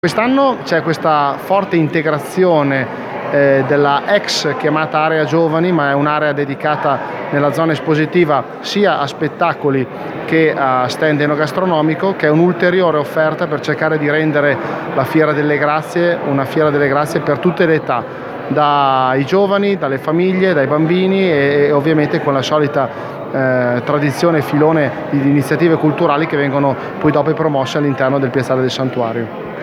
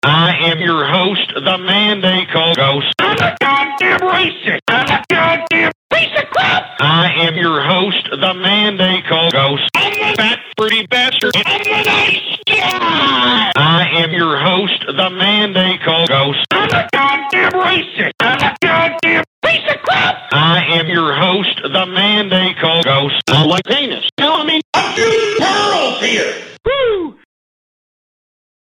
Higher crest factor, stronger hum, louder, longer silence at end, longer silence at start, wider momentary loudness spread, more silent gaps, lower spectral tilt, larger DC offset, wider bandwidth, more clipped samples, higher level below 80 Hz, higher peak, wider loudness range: about the same, 14 dB vs 14 dB; neither; about the same, -14 LUFS vs -12 LUFS; second, 0 s vs 1.65 s; about the same, 0.05 s vs 0.05 s; about the same, 5 LU vs 4 LU; second, none vs 4.62-4.66 s, 5.75-5.90 s, 19.27-19.42 s, 24.12-24.17 s, 24.64-24.73 s; first, -6.5 dB/octave vs -4.5 dB/octave; neither; about the same, 15.5 kHz vs 17 kHz; neither; about the same, -56 dBFS vs -52 dBFS; about the same, 0 dBFS vs 0 dBFS; about the same, 2 LU vs 1 LU